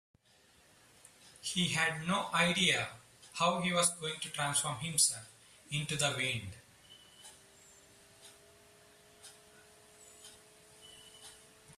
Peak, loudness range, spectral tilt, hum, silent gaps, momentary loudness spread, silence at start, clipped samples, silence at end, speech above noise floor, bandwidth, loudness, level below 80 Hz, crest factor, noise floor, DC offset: -14 dBFS; 8 LU; -2.5 dB/octave; none; none; 26 LU; 1.25 s; under 0.1%; 0.05 s; 33 dB; 15 kHz; -32 LUFS; -70 dBFS; 24 dB; -66 dBFS; under 0.1%